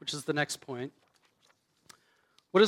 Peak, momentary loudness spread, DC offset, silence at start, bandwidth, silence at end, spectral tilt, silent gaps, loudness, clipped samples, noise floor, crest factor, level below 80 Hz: -10 dBFS; 10 LU; under 0.1%; 0 s; 16 kHz; 0 s; -4 dB/octave; none; -34 LUFS; under 0.1%; -70 dBFS; 22 dB; -84 dBFS